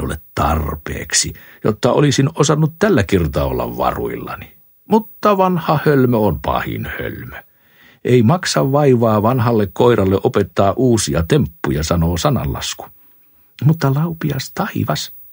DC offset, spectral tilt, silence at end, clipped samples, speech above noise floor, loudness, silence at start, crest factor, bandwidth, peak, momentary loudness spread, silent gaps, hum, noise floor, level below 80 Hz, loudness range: under 0.1%; -5.5 dB/octave; 0.05 s; under 0.1%; 34 dB; -16 LUFS; 0 s; 16 dB; 16.5 kHz; 0 dBFS; 11 LU; none; none; -50 dBFS; -34 dBFS; 4 LU